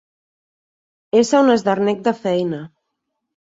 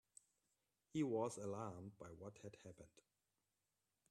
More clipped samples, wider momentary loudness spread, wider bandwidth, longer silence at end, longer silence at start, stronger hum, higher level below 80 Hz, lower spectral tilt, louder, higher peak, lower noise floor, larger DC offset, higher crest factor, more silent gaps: neither; second, 9 LU vs 24 LU; second, 8 kHz vs 13 kHz; second, 0.75 s vs 1.2 s; first, 1.15 s vs 0.95 s; neither; first, -64 dBFS vs -84 dBFS; about the same, -5.5 dB/octave vs -6.5 dB/octave; first, -17 LUFS vs -48 LUFS; first, -2 dBFS vs -30 dBFS; second, -76 dBFS vs under -90 dBFS; neither; about the same, 16 dB vs 20 dB; neither